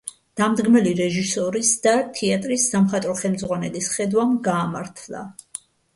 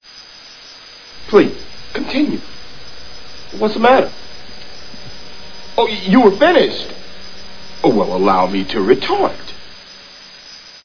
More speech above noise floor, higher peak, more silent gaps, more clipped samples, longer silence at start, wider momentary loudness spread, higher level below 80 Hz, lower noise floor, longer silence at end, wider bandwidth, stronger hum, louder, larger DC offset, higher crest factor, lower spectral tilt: second, 20 dB vs 24 dB; second, -6 dBFS vs 0 dBFS; neither; neither; about the same, 0.05 s vs 0 s; second, 17 LU vs 23 LU; second, -60 dBFS vs -46 dBFS; about the same, -41 dBFS vs -38 dBFS; first, 0.4 s vs 0 s; first, 11.5 kHz vs 5.4 kHz; neither; second, -20 LUFS vs -15 LUFS; second, under 0.1% vs 4%; about the same, 16 dB vs 18 dB; second, -4.5 dB/octave vs -6 dB/octave